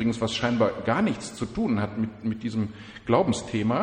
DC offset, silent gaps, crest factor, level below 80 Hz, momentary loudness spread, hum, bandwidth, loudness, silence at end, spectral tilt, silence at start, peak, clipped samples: under 0.1%; none; 18 dB; -52 dBFS; 8 LU; none; 10 kHz; -26 LUFS; 0 s; -6 dB/octave; 0 s; -8 dBFS; under 0.1%